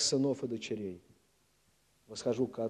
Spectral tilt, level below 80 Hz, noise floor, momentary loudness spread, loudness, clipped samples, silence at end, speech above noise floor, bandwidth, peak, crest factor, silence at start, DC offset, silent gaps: -4 dB/octave; -74 dBFS; -72 dBFS; 15 LU; -35 LUFS; under 0.1%; 0 s; 38 dB; 12.5 kHz; -18 dBFS; 18 dB; 0 s; under 0.1%; none